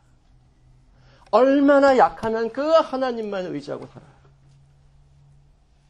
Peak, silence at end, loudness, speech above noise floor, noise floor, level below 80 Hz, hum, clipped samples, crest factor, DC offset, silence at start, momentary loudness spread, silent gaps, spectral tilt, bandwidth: -4 dBFS; 1.9 s; -19 LUFS; 37 dB; -56 dBFS; -54 dBFS; none; under 0.1%; 18 dB; under 0.1%; 1.35 s; 16 LU; none; -6 dB/octave; 9.6 kHz